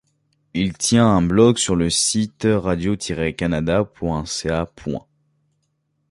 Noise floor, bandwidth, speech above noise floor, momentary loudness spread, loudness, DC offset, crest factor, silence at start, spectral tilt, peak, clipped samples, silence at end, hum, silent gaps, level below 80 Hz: -70 dBFS; 11.5 kHz; 51 dB; 11 LU; -19 LUFS; under 0.1%; 18 dB; 0.55 s; -4.5 dB/octave; -2 dBFS; under 0.1%; 1.1 s; none; none; -40 dBFS